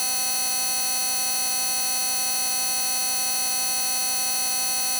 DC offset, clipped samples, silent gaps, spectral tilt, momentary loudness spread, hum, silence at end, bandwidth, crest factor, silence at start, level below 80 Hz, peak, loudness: under 0.1%; under 0.1%; none; 2 dB/octave; 0 LU; none; 0 s; over 20 kHz; 6 dB; 0 s; -62 dBFS; -18 dBFS; -20 LUFS